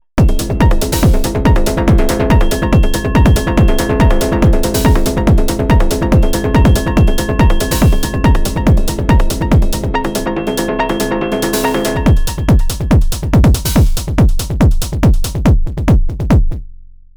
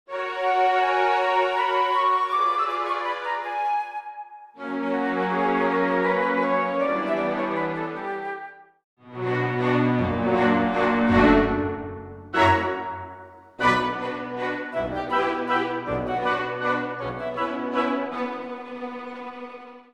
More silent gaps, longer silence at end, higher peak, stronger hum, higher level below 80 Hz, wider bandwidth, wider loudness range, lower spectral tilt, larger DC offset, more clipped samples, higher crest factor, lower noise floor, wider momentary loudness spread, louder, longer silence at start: second, none vs 8.84-8.97 s; first, 0.3 s vs 0.15 s; first, 0 dBFS vs -4 dBFS; neither; first, -14 dBFS vs -48 dBFS; first, over 20 kHz vs 11.5 kHz; second, 2 LU vs 5 LU; about the same, -6 dB/octave vs -6.5 dB/octave; neither; neither; second, 10 dB vs 20 dB; second, -34 dBFS vs -44 dBFS; second, 4 LU vs 15 LU; first, -13 LUFS vs -24 LUFS; about the same, 0.15 s vs 0.1 s